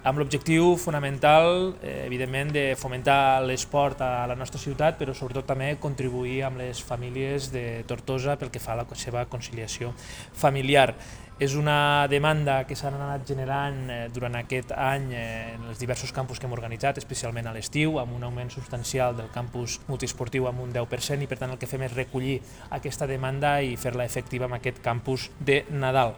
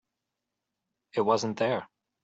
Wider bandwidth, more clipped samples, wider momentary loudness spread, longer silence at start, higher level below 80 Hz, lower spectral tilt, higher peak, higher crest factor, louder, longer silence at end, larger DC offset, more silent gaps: first, over 20 kHz vs 8 kHz; neither; first, 12 LU vs 8 LU; second, 0 s vs 1.15 s; first, -46 dBFS vs -74 dBFS; about the same, -5 dB/octave vs -5 dB/octave; first, -4 dBFS vs -12 dBFS; about the same, 22 dB vs 20 dB; about the same, -27 LUFS vs -29 LUFS; second, 0 s vs 0.4 s; neither; neither